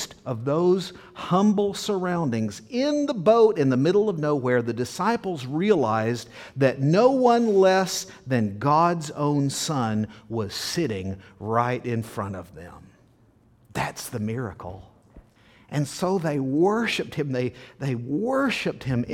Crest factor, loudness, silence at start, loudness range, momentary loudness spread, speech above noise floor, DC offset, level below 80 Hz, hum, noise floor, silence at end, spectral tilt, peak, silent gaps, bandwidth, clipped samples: 18 dB; -24 LUFS; 0 s; 10 LU; 13 LU; 35 dB; under 0.1%; -58 dBFS; none; -58 dBFS; 0 s; -6 dB/octave; -6 dBFS; none; 17 kHz; under 0.1%